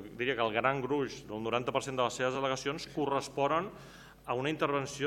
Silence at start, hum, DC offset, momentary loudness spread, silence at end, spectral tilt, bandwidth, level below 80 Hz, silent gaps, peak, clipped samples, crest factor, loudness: 0 s; none; under 0.1%; 8 LU; 0 s; -4.5 dB/octave; 17 kHz; -64 dBFS; none; -12 dBFS; under 0.1%; 22 dB; -33 LUFS